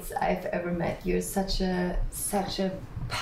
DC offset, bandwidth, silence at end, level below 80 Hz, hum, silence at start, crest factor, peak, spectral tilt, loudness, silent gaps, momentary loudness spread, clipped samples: under 0.1%; 16 kHz; 0 s; -38 dBFS; none; 0 s; 14 dB; -16 dBFS; -4.5 dB/octave; -30 LUFS; none; 3 LU; under 0.1%